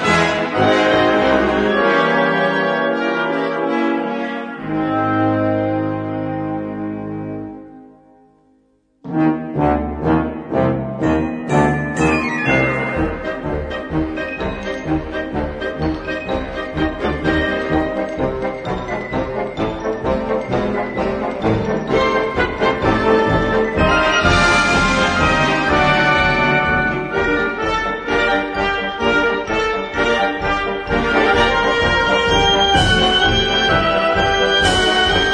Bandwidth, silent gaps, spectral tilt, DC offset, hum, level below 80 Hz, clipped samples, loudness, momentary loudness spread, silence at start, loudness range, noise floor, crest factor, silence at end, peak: 10.5 kHz; none; -5 dB/octave; under 0.1%; none; -32 dBFS; under 0.1%; -17 LUFS; 10 LU; 0 s; 8 LU; -58 dBFS; 16 dB; 0 s; 0 dBFS